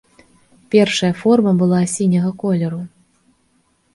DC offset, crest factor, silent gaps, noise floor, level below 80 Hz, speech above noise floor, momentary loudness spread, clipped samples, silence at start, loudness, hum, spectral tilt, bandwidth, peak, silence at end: under 0.1%; 16 dB; none; -61 dBFS; -58 dBFS; 46 dB; 9 LU; under 0.1%; 0.7 s; -16 LUFS; none; -6 dB/octave; 11.5 kHz; 0 dBFS; 1.05 s